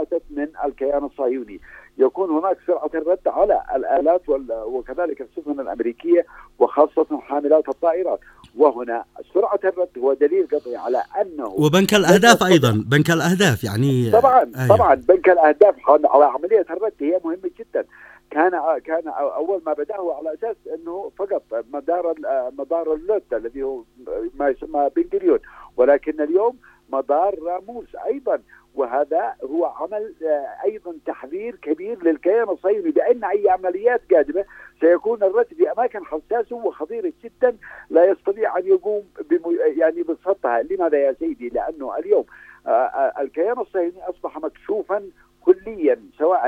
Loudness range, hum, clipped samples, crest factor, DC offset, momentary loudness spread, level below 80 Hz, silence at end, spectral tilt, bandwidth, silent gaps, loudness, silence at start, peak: 9 LU; none; under 0.1%; 20 dB; under 0.1%; 13 LU; -54 dBFS; 0 s; -5.5 dB/octave; 16 kHz; none; -20 LUFS; 0 s; 0 dBFS